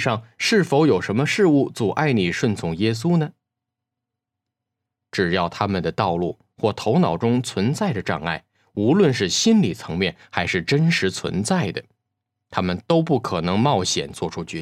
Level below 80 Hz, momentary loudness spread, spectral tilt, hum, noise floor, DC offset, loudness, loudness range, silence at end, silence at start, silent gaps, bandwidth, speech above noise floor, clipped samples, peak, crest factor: -58 dBFS; 8 LU; -5.5 dB/octave; none; -84 dBFS; under 0.1%; -21 LUFS; 5 LU; 0 s; 0 s; none; 14 kHz; 64 dB; under 0.1%; -2 dBFS; 20 dB